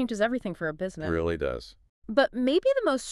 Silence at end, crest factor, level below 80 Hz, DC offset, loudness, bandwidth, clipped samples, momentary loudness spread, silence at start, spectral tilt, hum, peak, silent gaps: 0 s; 20 dB; -48 dBFS; under 0.1%; -27 LUFS; 12 kHz; under 0.1%; 9 LU; 0 s; -5.5 dB/octave; none; -8 dBFS; 1.89-2.02 s